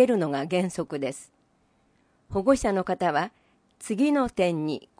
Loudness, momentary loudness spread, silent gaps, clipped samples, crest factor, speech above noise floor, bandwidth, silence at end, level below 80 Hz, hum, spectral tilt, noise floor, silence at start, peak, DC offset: -26 LUFS; 11 LU; none; under 0.1%; 20 dB; 41 dB; 10.5 kHz; 0.2 s; -52 dBFS; none; -6 dB/octave; -66 dBFS; 0 s; -6 dBFS; under 0.1%